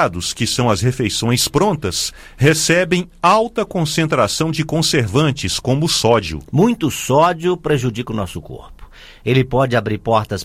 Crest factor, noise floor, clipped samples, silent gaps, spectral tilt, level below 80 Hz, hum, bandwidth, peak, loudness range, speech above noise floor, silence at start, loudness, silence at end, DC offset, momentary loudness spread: 16 dB; -39 dBFS; under 0.1%; none; -4.5 dB/octave; -40 dBFS; none; 16 kHz; 0 dBFS; 3 LU; 22 dB; 0 s; -16 LUFS; 0 s; under 0.1%; 7 LU